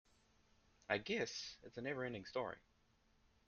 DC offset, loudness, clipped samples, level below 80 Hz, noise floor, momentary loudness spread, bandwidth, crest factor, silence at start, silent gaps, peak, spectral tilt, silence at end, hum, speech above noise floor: under 0.1%; -44 LUFS; under 0.1%; -76 dBFS; -76 dBFS; 10 LU; 7.8 kHz; 26 dB; 0.9 s; none; -22 dBFS; -2.5 dB/octave; 0.9 s; none; 31 dB